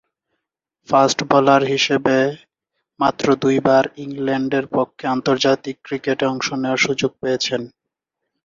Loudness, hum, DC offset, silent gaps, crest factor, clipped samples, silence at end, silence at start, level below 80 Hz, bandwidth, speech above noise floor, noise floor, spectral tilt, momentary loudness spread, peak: -18 LUFS; none; under 0.1%; none; 18 dB; under 0.1%; 0.75 s; 0.9 s; -58 dBFS; 7.6 kHz; 62 dB; -80 dBFS; -4.5 dB/octave; 8 LU; -2 dBFS